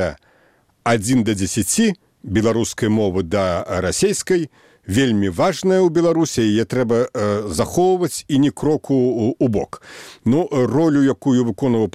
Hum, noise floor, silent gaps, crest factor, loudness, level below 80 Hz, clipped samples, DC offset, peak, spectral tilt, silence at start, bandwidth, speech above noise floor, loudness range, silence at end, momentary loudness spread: none; -57 dBFS; none; 16 dB; -18 LUFS; -46 dBFS; under 0.1%; 0.2%; -2 dBFS; -5.5 dB/octave; 0 s; 16 kHz; 39 dB; 2 LU; 0.05 s; 5 LU